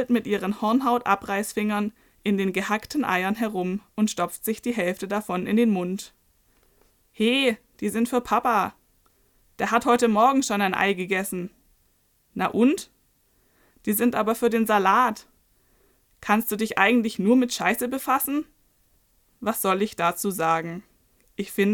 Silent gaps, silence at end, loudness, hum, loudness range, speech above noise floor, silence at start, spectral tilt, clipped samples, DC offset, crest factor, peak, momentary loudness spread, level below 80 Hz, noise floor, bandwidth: none; 0 s; -24 LUFS; none; 4 LU; 42 dB; 0 s; -4.5 dB/octave; under 0.1%; under 0.1%; 22 dB; -2 dBFS; 11 LU; -60 dBFS; -65 dBFS; 19 kHz